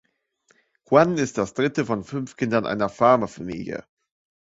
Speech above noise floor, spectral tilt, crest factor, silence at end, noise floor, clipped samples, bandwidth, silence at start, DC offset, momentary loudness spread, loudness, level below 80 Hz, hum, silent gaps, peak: 43 dB; -6 dB/octave; 22 dB; 0.75 s; -65 dBFS; under 0.1%; 8 kHz; 0.9 s; under 0.1%; 14 LU; -22 LUFS; -58 dBFS; none; none; -2 dBFS